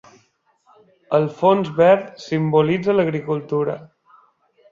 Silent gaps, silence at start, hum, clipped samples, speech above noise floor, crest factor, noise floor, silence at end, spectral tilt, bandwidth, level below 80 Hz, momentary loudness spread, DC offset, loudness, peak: none; 1.1 s; none; under 0.1%; 44 dB; 18 dB; -62 dBFS; 0.85 s; -8 dB/octave; 7.4 kHz; -62 dBFS; 10 LU; under 0.1%; -19 LUFS; -2 dBFS